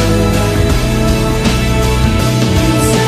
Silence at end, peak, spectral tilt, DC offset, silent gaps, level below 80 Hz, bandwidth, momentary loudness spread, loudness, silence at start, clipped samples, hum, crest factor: 0 s; 0 dBFS; -5.5 dB/octave; under 0.1%; none; -18 dBFS; 15.5 kHz; 2 LU; -12 LUFS; 0 s; under 0.1%; none; 12 dB